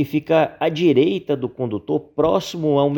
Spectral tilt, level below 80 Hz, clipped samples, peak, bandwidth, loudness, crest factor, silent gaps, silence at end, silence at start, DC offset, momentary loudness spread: -7 dB/octave; -54 dBFS; under 0.1%; -4 dBFS; 19 kHz; -20 LUFS; 16 dB; none; 0 s; 0 s; under 0.1%; 8 LU